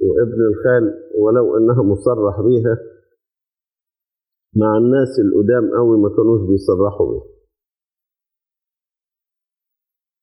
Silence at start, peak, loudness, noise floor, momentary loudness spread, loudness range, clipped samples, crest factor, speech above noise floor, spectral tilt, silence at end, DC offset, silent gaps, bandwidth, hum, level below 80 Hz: 0 s; -2 dBFS; -15 LUFS; under -90 dBFS; 6 LU; 7 LU; under 0.1%; 14 dB; over 76 dB; -10 dB/octave; 3 s; under 0.1%; none; 10 kHz; none; -48 dBFS